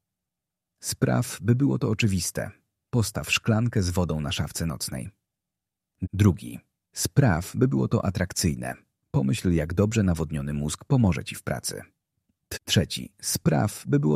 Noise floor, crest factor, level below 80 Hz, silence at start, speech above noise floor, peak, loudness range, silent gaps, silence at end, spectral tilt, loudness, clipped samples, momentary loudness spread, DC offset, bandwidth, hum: -87 dBFS; 20 dB; -46 dBFS; 0.85 s; 62 dB; -6 dBFS; 3 LU; none; 0 s; -5.5 dB/octave; -26 LUFS; under 0.1%; 12 LU; under 0.1%; 15.5 kHz; none